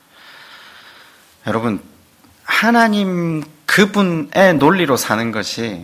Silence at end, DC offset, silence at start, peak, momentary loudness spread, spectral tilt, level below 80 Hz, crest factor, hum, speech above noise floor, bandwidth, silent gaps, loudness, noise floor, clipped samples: 0 s; under 0.1%; 0.4 s; 0 dBFS; 11 LU; -5 dB/octave; -54 dBFS; 18 dB; none; 34 dB; 16 kHz; none; -15 LUFS; -49 dBFS; 0.2%